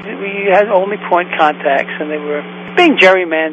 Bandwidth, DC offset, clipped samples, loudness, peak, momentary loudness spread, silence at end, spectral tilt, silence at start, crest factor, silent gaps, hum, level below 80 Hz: 9.2 kHz; under 0.1%; 0.2%; -13 LUFS; 0 dBFS; 12 LU; 0 s; -5.5 dB/octave; 0 s; 12 dB; none; none; -64 dBFS